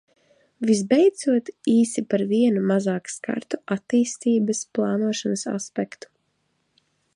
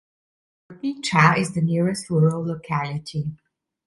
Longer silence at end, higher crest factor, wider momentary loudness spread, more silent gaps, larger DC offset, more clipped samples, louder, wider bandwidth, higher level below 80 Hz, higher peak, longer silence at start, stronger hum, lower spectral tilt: first, 1.3 s vs 0.5 s; about the same, 18 dB vs 22 dB; second, 10 LU vs 13 LU; neither; neither; neither; about the same, -23 LUFS vs -22 LUFS; about the same, 11 kHz vs 11.5 kHz; second, -72 dBFS vs -58 dBFS; second, -6 dBFS vs 0 dBFS; about the same, 0.6 s vs 0.7 s; neither; about the same, -5.5 dB/octave vs -6 dB/octave